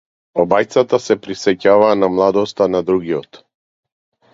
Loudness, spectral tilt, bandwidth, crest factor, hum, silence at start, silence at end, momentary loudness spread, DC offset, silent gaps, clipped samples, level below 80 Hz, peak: -15 LUFS; -5.5 dB/octave; 7.8 kHz; 16 dB; none; 0.35 s; 1.1 s; 8 LU; under 0.1%; none; under 0.1%; -54 dBFS; 0 dBFS